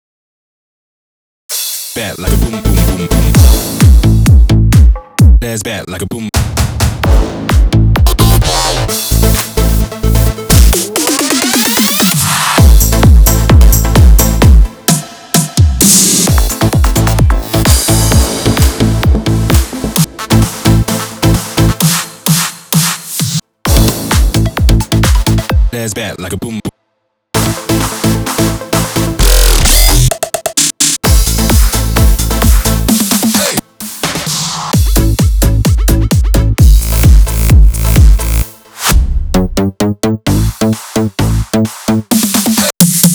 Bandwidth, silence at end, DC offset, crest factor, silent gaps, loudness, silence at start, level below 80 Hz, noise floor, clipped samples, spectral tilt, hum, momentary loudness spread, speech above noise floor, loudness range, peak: over 20 kHz; 0 s; under 0.1%; 8 dB; none; -10 LUFS; 1.5 s; -12 dBFS; -65 dBFS; 3%; -4.5 dB/octave; none; 8 LU; 53 dB; 5 LU; 0 dBFS